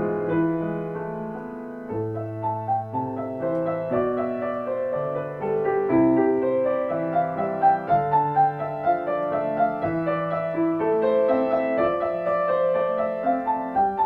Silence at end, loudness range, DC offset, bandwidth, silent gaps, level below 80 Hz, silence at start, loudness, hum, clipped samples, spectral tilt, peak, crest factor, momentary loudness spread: 0 s; 6 LU; under 0.1%; 5 kHz; none; -58 dBFS; 0 s; -24 LUFS; none; under 0.1%; -10 dB/octave; -8 dBFS; 16 dB; 8 LU